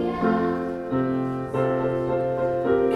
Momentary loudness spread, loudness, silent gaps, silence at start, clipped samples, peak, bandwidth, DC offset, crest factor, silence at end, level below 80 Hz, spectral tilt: 4 LU; -24 LUFS; none; 0 s; under 0.1%; -8 dBFS; 9.6 kHz; under 0.1%; 14 dB; 0 s; -50 dBFS; -9 dB/octave